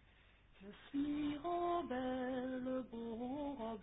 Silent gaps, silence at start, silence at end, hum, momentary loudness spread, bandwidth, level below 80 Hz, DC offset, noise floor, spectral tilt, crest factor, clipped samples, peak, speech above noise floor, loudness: none; 0.55 s; 0 s; none; 8 LU; 3.9 kHz; -66 dBFS; under 0.1%; -67 dBFS; -2.5 dB/octave; 14 dB; under 0.1%; -28 dBFS; 26 dB; -42 LUFS